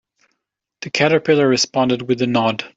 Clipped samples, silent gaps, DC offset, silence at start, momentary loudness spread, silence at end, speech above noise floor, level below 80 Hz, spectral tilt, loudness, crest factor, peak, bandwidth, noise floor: under 0.1%; none; under 0.1%; 0.8 s; 6 LU; 0.1 s; 61 dB; -60 dBFS; -4.5 dB/octave; -17 LUFS; 16 dB; -2 dBFS; 8 kHz; -78 dBFS